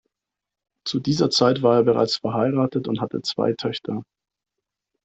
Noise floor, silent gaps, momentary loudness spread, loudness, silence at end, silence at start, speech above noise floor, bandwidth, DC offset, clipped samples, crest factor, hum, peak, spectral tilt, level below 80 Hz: -86 dBFS; none; 11 LU; -21 LUFS; 1 s; 0.85 s; 65 dB; 8.2 kHz; under 0.1%; under 0.1%; 18 dB; none; -4 dBFS; -5.5 dB/octave; -62 dBFS